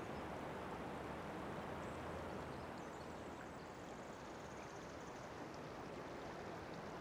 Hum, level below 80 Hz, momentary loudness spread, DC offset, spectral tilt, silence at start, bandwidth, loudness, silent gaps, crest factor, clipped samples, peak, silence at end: none; -66 dBFS; 4 LU; under 0.1%; -5.5 dB/octave; 0 s; over 20 kHz; -50 LUFS; none; 14 dB; under 0.1%; -36 dBFS; 0 s